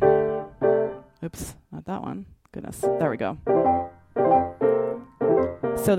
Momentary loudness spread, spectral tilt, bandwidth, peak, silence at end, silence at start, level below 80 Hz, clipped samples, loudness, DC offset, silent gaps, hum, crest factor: 17 LU; -7 dB/octave; 16 kHz; -6 dBFS; 0 s; 0 s; -52 dBFS; under 0.1%; -24 LUFS; under 0.1%; none; none; 18 dB